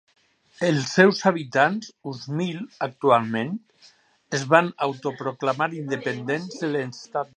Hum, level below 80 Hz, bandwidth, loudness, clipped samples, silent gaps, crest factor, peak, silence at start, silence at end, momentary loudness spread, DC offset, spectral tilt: none; -72 dBFS; 9.6 kHz; -23 LUFS; under 0.1%; none; 22 dB; -2 dBFS; 0.6 s; 0.1 s; 13 LU; under 0.1%; -5.5 dB/octave